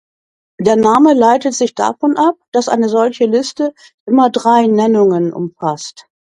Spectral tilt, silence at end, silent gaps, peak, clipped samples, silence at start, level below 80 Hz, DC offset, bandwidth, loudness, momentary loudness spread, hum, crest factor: -5.5 dB/octave; 0.3 s; 2.48-2.52 s, 3.94-4.06 s; 0 dBFS; under 0.1%; 0.6 s; -58 dBFS; under 0.1%; 11 kHz; -13 LUFS; 11 LU; none; 12 dB